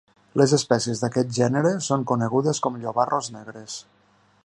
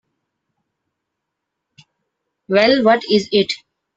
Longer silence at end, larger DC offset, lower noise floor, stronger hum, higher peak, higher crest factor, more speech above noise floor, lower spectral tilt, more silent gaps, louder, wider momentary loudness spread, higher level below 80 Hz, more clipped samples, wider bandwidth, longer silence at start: first, 0.65 s vs 0.4 s; neither; second, -60 dBFS vs -79 dBFS; neither; about the same, -4 dBFS vs -2 dBFS; about the same, 20 dB vs 18 dB; second, 38 dB vs 64 dB; about the same, -5 dB/octave vs -5 dB/octave; neither; second, -23 LUFS vs -15 LUFS; first, 16 LU vs 9 LU; about the same, -64 dBFS vs -60 dBFS; neither; first, 11.5 kHz vs 8.2 kHz; second, 0.35 s vs 2.5 s